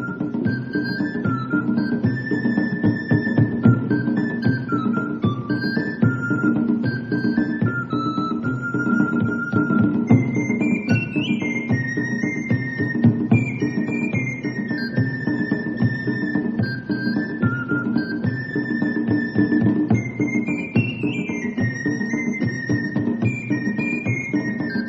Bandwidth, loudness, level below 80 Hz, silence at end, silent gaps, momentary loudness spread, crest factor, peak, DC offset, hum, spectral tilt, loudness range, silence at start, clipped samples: 7.6 kHz; -22 LUFS; -50 dBFS; 0 s; none; 5 LU; 18 dB; -2 dBFS; under 0.1%; none; -8 dB/octave; 3 LU; 0 s; under 0.1%